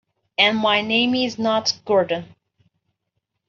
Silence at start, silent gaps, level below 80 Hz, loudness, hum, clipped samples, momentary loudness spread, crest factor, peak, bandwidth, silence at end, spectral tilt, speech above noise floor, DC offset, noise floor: 0.4 s; none; -66 dBFS; -19 LUFS; none; under 0.1%; 8 LU; 20 dB; -2 dBFS; 7.4 kHz; 1.25 s; -1 dB/octave; 57 dB; under 0.1%; -77 dBFS